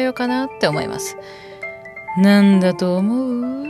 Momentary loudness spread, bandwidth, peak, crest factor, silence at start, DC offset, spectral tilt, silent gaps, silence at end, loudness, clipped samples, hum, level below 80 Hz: 19 LU; 13.5 kHz; -2 dBFS; 16 dB; 0 s; under 0.1%; -6 dB/octave; none; 0 s; -17 LUFS; under 0.1%; none; -58 dBFS